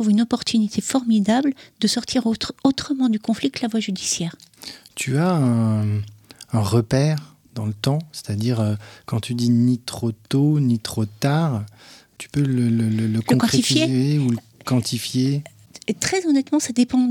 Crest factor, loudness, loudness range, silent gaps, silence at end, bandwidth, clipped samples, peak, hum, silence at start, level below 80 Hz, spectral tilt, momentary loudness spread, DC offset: 18 dB; -21 LUFS; 3 LU; none; 0 s; 17.5 kHz; under 0.1%; -2 dBFS; none; 0 s; -56 dBFS; -5.5 dB/octave; 10 LU; under 0.1%